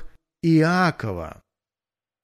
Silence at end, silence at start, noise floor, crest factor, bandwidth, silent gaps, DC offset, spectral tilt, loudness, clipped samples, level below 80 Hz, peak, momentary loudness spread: 0.9 s; 0 s; under -90 dBFS; 16 dB; 13 kHz; none; under 0.1%; -7 dB/octave; -21 LUFS; under 0.1%; -50 dBFS; -6 dBFS; 16 LU